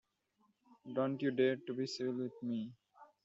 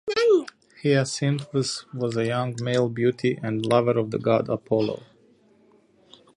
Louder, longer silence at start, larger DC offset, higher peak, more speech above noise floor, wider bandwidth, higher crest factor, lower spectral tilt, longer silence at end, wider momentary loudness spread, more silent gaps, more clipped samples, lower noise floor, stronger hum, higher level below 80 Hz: second, -38 LUFS vs -24 LUFS; first, 0.7 s vs 0.05 s; neither; second, -20 dBFS vs -6 dBFS; first, 40 dB vs 35 dB; second, 7.6 kHz vs 11.5 kHz; about the same, 20 dB vs 18 dB; about the same, -5 dB/octave vs -6 dB/octave; second, 0.2 s vs 1.35 s; about the same, 10 LU vs 8 LU; neither; neither; first, -77 dBFS vs -59 dBFS; neither; second, -84 dBFS vs -64 dBFS